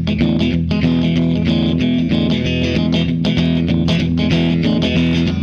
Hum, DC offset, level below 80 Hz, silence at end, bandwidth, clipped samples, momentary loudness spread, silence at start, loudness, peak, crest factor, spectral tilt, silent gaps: none; under 0.1%; -32 dBFS; 0 s; 7 kHz; under 0.1%; 1 LU; 0 s; -16 LUFS; -6 dBFS; 8 dB; -7.5 dB/octave; none